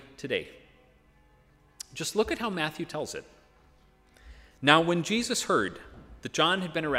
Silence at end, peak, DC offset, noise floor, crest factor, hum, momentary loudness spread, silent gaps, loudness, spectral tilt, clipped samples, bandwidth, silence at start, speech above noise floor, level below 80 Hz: 0 s; -2 dBFS; under 0.1%; -61 dBFS; 28 dB; none; 20 LU; none; -28 LUFS; -3.5 dB/octave; under 0.1%; 16 kHz; 0 s; 33 dB; -58 dBFS